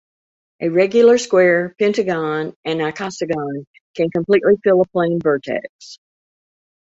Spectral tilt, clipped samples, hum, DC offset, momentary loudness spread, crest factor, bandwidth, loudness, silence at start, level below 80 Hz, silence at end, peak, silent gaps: -5.5 dB/octave; under 0.1%; none; under 0.1%; 13 LU; 16 dB; 8 kHz; -17 LUFS; 0.6 s; -60 dBFS; 0.9 s; -2 dBFS; 2.56-2.63 s, 3.67-3.74 s, 3.81-3.94 s, 5.69-5.79 s